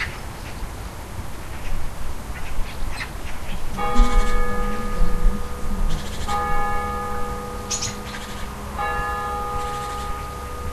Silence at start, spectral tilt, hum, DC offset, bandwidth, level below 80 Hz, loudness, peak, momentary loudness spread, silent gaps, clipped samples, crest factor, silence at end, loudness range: 0 s; -4 dB/octave; none; under 0.1%; 13.5 kHz; -24 dBFS; -28 LUFS; -2 dBFS; 10 LU; none; under 0.1%; 18 dB; 0 s; 7 LU